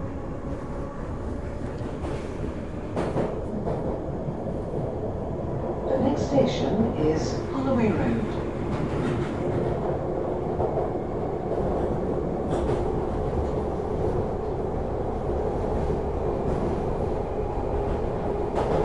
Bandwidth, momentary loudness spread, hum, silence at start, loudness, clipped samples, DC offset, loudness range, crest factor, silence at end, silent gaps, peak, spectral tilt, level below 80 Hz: 11 kHz; 9 LU; none; 0 s; -28 LUFS; under 0.1%; 0.7%; 5 LU; 18 dB; 0 s; none; -8 dBFS; -8 dB/octave; -36 dBFS